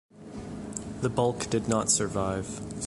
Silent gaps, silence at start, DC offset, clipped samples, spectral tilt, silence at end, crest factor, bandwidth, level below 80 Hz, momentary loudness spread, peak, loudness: none; 0.15 s; under 0.1%; under 0.1%; -4 dB/octave; 0 s; 20 dB; 11.5 kHz; -50 dBFS; 15 LU; -10 dBFS; -28 LUFS